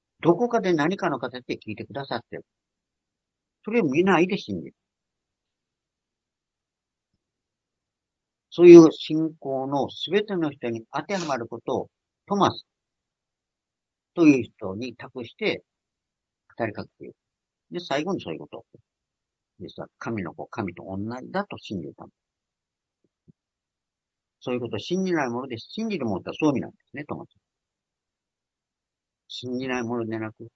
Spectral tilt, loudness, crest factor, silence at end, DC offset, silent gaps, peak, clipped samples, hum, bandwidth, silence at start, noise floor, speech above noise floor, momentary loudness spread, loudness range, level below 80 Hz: -6.5 dB/octave; -23 LUFS; 26 dB; 0.1 s; under 0.1%; none; 0 dBFS; under 0.1%; none; 7.4 kHz; 0.25 s; -88 dBFS; 65 dB; 18 LU; 17 LU; -70 dBFS